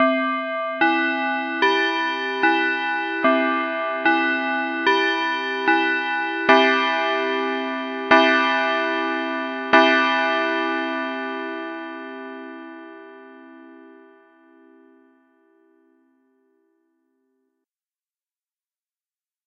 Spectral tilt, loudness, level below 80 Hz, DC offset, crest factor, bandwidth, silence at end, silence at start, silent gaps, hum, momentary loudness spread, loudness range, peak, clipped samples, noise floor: -3 dB/octave; -20 LUFS; -74 dBFS; under 0.1%; 20 dB; 7.8 kHz; 5.55 s; 0 s; none; none; 15 LU; 14 LU; -2 dBFS; under 0.1%; under -90 dBFS